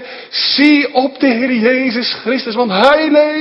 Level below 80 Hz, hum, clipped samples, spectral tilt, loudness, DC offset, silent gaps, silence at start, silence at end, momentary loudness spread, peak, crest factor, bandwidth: -56 dBFS; none; 0.1%; -5.5 dB/octave; -12 LUFS; under 0.1%; none; 0 s; 0 s; 7 LU; 0 dBFS; 12 dB; 7.6 kHz